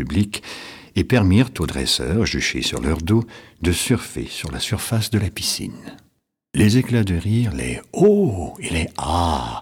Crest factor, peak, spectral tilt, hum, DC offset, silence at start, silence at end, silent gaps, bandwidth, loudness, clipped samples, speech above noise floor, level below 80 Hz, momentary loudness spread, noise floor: 16 dB; -4 dBFS; -5 dB/octave; none; under 0.1%; 0 s; 0 s; none; 17.5 kHz; -20 LUFS; under 0.1%; 45 dB; -36 dBFS; 11 LU; -65 dBFS